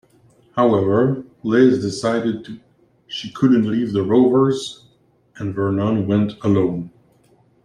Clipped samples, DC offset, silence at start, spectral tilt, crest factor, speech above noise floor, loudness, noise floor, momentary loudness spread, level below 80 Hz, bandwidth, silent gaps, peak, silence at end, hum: under 0.1%; under 0.1%; 0.55 s; -7 dB/octave; 16 dB; 40 dB; -18 LUFS; -57 dBFS; 15 LU; -58 dBFS; 10.5 kHz; none; -2 dBFS; 0.75 s; none